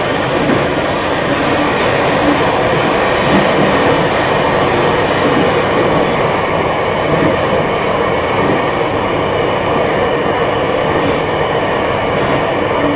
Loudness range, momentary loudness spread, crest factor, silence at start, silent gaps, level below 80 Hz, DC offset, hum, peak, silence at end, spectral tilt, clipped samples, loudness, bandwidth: 2 LU; 3 LU; 14 dB; 0 s; none; -34 dBFS; under 0.1%; none; 0 dBFS; 0 s; -9.5 dB/octave; under 0.1%; -13 LUFS; 4 kHz